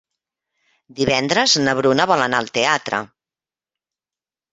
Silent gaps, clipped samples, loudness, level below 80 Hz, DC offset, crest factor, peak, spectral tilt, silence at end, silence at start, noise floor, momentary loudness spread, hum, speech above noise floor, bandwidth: none; under 0.1%; -17 LUFS; -56 dBFS; under 0.1%; 20 dB; -2 dBFS; -3 dB/octave; 1.45 s; 0.95 s; under -90 dBFS; 8 LU; none; over 72 dB; 9.4 kHz